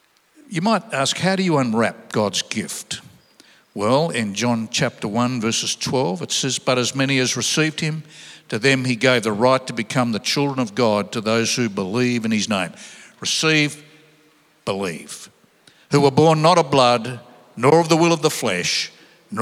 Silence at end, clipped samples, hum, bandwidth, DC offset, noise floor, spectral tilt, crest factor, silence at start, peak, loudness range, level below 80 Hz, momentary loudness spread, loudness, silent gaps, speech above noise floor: 0 s; under 0.1%; none; 15.5 kHz; under 0.1%; -56 dBFS; -4 dB/octave; 20 dB; 0.5 s; 0 dBFS; 5 LU; -68 dBFS; 14 LU; -19 LUFS; none; 37 dB